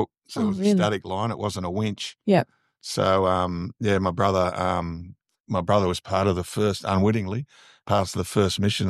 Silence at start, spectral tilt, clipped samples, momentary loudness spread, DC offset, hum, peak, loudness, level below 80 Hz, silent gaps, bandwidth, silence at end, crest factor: 0 s; -6 dB/octave; under 0.1%; 9 LU; under 0.1%; none; -6 dBFS; -24 LUFS; -52 dBFS; 5.40-5.44 s; 13.5 kHz; 0 s; 18 dB